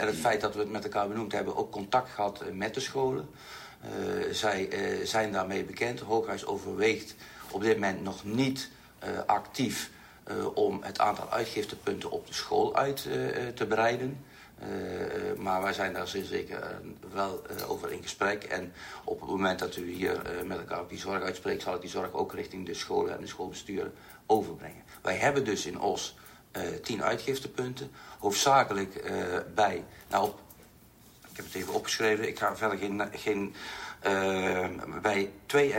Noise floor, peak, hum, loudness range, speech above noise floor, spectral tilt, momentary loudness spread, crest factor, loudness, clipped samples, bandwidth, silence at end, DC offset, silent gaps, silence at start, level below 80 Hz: -57 dBFS; -8 dBFS; none; 4 LU; 25 dB; -4 dB/octave; 12 LU; 22 dB; -32 LUFS; under 0.1%; 16 kHz; 0 s; under 0.1%; none; 0 s; -62 dBFS